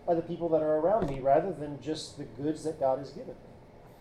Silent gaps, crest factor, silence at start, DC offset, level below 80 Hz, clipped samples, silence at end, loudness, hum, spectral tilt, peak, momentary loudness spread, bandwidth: none; 18 dB; 0 s; under 0.1%; -54 dBFS; under 0.1%; 0.05 s; -30 LUFS; none; -6.5 dB/octave; -14 dBFS; 16 LU; 11.5 kHz